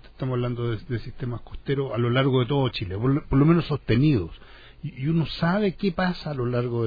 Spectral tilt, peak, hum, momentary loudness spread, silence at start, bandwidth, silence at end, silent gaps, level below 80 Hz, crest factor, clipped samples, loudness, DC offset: -9.5 dB/octave; -6 dBFS; none; 12 LU; 0 s; 5 kHz; 0 s; none; -42 dBFS; 18 dB; under 0.1%; -24 LUFS; under 0.1%